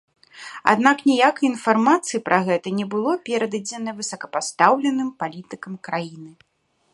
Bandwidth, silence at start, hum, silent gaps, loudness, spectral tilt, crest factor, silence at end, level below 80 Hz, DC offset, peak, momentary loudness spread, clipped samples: 11.5 kHz; 0.35 s; none; none; -21 LUFS; -4 dB/octave; 22 dB; 0.65 s; -70 dBFS; under 0.1%; 0 dBFS; 14 LU; under 0.1%